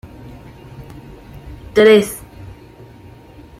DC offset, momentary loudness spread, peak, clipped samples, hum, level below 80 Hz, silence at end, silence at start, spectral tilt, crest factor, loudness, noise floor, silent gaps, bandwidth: under 0.1%; 28 LU; -2 dBFS; under 0.1%; none; -44 dBFS; 1.45 s; 0.8 s; -5 dB/octave; 18 dB; -13 LUFS; -40 dBFS; none; 16 kHz